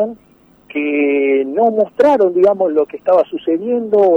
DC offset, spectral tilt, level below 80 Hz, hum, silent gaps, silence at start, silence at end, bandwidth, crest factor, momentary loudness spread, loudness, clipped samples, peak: under 0.1%; -7.5 dB/octave; -60 dBFS; none; none; 0 s; 0 s; 6.4 kHz; 12 dB; 7 LU; -14 LUFS; under 0.1%; -2 dBFS